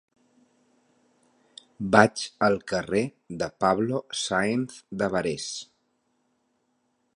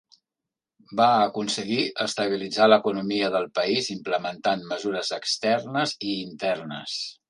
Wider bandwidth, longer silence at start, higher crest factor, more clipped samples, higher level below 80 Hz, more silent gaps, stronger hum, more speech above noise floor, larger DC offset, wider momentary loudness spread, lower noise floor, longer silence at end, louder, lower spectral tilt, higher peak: about the same, 11 kHz vs 11.5 kHz; first, 1.8 s vs 0.9 s; first, 28 dB vs 20 dB; neither; first, -60 dBFS vs -70 dBFS; neither; neither; second, 47 dB vs 63 dB; neither; first, 14 LU vs 10 LU; second, -73 dBFS vs -88 dBFS; first, 1.55 s vs 0.15 s; about the same, -26 LUFS vs -24 LUFS; about the same, -4.5 dB/octave vs -3.5 dB/octave; first, 0 dBFS vs -4 dBFS